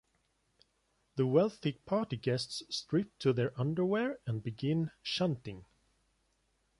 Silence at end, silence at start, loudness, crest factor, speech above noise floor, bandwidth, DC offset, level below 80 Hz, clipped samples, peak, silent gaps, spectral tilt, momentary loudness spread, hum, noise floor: 1.15 s; 1.15 s; -34 LUFS; 20 dB; 43 dB; 11.5 kHz; under 0.1%; -68 dBFS; under 0.1%; -14 dBFS; none; -6.5 dB/octave; 9 LU; none; -76 dBFS